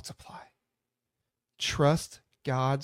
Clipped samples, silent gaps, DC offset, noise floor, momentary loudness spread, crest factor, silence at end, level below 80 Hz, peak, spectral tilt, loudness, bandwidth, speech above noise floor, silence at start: under 0.1%; none; under 0.1%; -86 dBFS; 22 LU; 20 dB; 0 s; -58 dBFS; -12 dBFS; -5 dB/octave; -29 LUFS; 15.5 kHz; 57 dB; 0.05 s